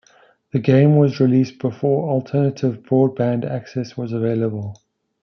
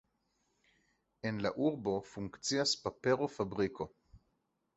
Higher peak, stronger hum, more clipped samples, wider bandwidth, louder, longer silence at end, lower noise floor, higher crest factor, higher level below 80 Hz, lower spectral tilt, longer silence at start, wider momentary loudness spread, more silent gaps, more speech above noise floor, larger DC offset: first, -4 dBFS vs -16 dBFS; neither; neither; second, 6.4 kHz vs 8 kHz; first, -19 LUFS vs -36 LUFS; about the same, 0.5 s vs 0.6 s; second, -54 dBFS vs -81 dBFS; about the same, 16 dB vs 20 dB; about the same, -64 dBFS vs -66 dBFS; first, -9 dB/octave vs -4 dB/octave; second, 0.55 s vs 1.25 s; about the same, 11 LU vs 10 LU; neither; second, 36 dB vs 45 dB; neither